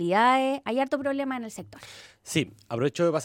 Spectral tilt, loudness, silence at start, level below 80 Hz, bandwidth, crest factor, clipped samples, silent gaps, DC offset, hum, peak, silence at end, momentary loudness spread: -5 dB/octave; -26 LUFS; 0 s; -68 dBFS; 16.5 kHz; 16 dB; under 0.1%; none; under 0.1%; none; -10 dBFS; 0 s; 22 LU